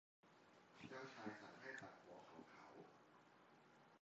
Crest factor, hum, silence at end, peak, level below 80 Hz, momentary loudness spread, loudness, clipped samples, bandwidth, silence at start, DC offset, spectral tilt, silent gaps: 22 dB; none; 0.05 s; -40 dBFS; under -90 dBFS; 11 LU; -59 LUFS; under 0.1%; 7.6 kHz; 0.25 s; under 0.1%; -3.5 dB/octave; none